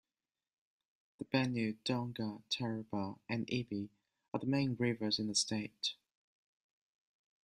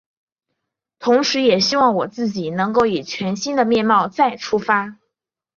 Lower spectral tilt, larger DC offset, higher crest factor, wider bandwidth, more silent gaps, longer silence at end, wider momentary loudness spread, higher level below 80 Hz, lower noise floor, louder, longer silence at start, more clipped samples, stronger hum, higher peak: about the same, -4.5 dB/octave vs -4.5 dB/octave; neither; about the same, 22 dB vs 18 dB; first, 13 kHz vs 7.4 kHz; first, 4.28-4.32 s vs none; first, 1.6 s vs 0.65 s; about the same, 9 LU vs 8 LU; second, -76 dBFS vs -60 dBFS; first, under -90 dBFS vs -80 dBFS; second, -37 LUFS vs -18 LUFS; first, 1.2 s vs 1 s; neither; neither; second, -18 dBFS vs -2 dBFS